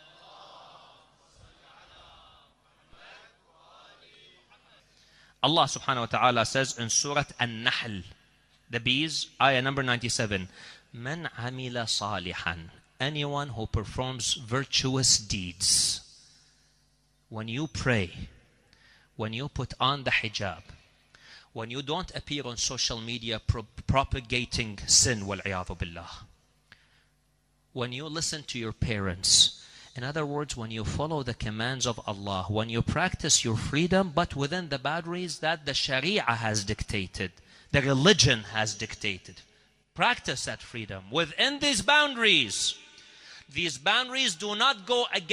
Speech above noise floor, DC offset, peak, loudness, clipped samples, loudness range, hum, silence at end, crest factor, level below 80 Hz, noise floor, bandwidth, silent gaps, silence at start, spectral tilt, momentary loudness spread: 40 dB; under 0.1%; -6 dBFS; -27 LUFS; under 0.1%; 7 LU; none; 0 s; 24 dB; -48 dBFS; -69 dBFS; 15 kHz; none; 0.25 s; -2.5 dB/octave; 15 LU